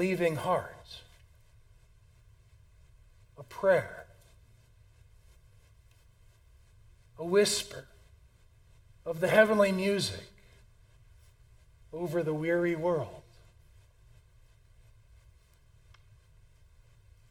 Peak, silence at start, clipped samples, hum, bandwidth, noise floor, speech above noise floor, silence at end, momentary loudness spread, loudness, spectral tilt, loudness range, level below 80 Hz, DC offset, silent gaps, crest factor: -8 dBFS; 0 s; under 0.1%; none; 17 kHz; -61 dBFS; 32 dB; 4.1 s; 24 LU; -29 LUFS; -4.5 dB/octave; 8 LU; -60 dBFS; under 0.1%; none; 26 dB